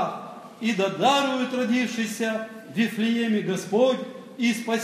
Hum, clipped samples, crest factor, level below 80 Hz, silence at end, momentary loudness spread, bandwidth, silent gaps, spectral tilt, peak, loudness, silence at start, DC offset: none; under 0.1%; 16 dB; -80 dBFS; 0 s; 10 LU; 15 kHz; none; -4.5 dB/octave; -8 dBFS; -25 LUFS; 0 s; under 0.1%